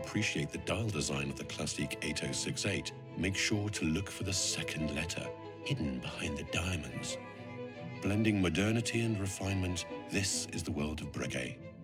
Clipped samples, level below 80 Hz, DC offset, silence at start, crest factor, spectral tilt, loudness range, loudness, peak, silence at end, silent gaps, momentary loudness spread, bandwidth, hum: under 0.1%; -54 dBFS; under 0.1%; 0 s; 20 dB; -4 dB/octave; 3 LU; -35 LUFS; -16 dBFS; 0 s; none; 9 LU; 16 kHz; none